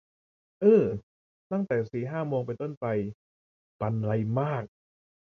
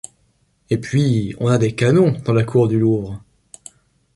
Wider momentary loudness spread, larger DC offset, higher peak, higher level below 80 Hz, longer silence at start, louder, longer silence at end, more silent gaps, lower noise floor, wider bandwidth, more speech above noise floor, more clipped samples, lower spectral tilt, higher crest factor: about the same, 13 LU vs 11 LU; neither; second, -10 dBFS vs -2 dBFS; second, -62 dBFS vs -48 dBFS; about the same, 0.6 s vs 0.7 s; second, -28 LUFS vs -17 LUFS; second, 0.55 s vs 0.95 s; first, 1.03-1.50 s, 2.77-2.81 s, 3.14-3.80 s vs none; first, under -90 dBFS vs -61 dBFS; second, 6.4 kHz vs 11.5 kHz; first, over 63 dB vs 45 dB; neither; first, -10 dB/octave vs -7.5 dB/octave; about the same, 20 dB vs 16 dB